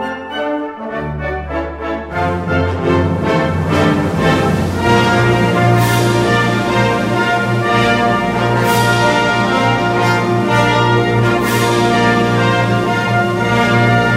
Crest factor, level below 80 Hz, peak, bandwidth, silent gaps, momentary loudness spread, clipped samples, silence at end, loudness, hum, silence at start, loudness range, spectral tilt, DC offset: 12 dB; -36 dBFS; 0 dBFS; 16 kHz; none; 9 LU; under 0.1%; 0 s; -14 LUFS; none; 0 s; 3 LU; -6 dB/octave; under 0.1%